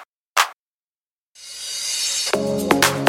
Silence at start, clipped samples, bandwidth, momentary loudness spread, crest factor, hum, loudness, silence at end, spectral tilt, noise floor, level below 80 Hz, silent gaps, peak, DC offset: 0 s; under 0.1%; 17 kHz; 14 LU; 20 dB; none; -21 LUFS; 0 s; -2 dB/octave; under -90 dBFS; -56 dBFS; 0.07-0.35 s, 0.53-1.34 s; -2 dBFS; under 0.1%